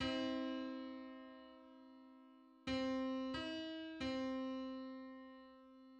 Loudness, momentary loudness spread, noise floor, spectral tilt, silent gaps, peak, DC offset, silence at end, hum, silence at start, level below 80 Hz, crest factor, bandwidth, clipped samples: -45 LUFS; 20 LU; -64 dBFS; -5 dB/octave; none; -30 dBFS; under 0.1%; 0 s; none; 0 s; -70 dBFS; 16 dB; 8.6 kHz; under 0.1%